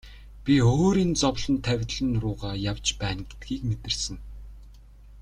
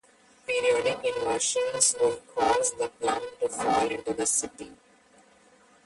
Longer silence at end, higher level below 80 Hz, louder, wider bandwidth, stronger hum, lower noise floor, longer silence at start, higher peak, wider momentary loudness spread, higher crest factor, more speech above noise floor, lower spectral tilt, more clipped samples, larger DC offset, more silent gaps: second, 0 s vs 1.1 s; first, -40 dBFS vs -62 dBFS; about the same, -26 LUFS vs -26 LUFS; about the same, 11 kHz vs 11.5 kHz; neither; second, -48 dBFS vs -59 dBFS; second, 0.05 s vs 0.5 s; about the same, -8 dBFS vs -8 dBFS; first, 14 LU vs 8 LU; about the same, 18 dB vs 20 dB; second, 23 dB vs 32 dB; first, -5 dB/octave vs -1.5 dB/octave; neither; neither; neither